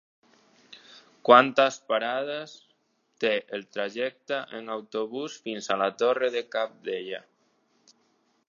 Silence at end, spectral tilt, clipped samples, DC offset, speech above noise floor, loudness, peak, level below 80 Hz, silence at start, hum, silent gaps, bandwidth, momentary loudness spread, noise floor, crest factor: 1.3 s; -3.5 dB/octave; under 0.1%; under 0.1%; 44 dB; -26 LUFS; -2 dBFS; -86 dBFS; 0.7 s; none; none; 7.4 kHz; 17 LU; -70 dBFS; 26 dB